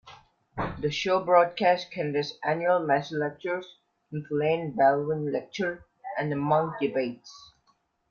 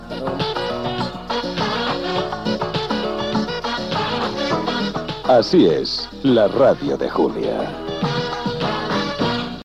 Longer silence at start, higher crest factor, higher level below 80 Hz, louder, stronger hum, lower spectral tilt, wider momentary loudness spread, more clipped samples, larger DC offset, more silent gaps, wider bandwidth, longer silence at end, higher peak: about the same, 0.05 s vs 0 s; first, 22 dB vs 16 dB; second, -60 dBFS vs -44 dBFS; second, -27 LUFS vs -20 LUFS; neither; about the same, -6 dB/octave vs -6 dB/octave; first, 13 LU vs 9 LU; neither; second, under 0.1% vs 0.2%; neither; second, 7.2 kHz vs 12 kHz; first, 0.65 s vs 0 s; about the same, -6 dBFS vs -4 dBFS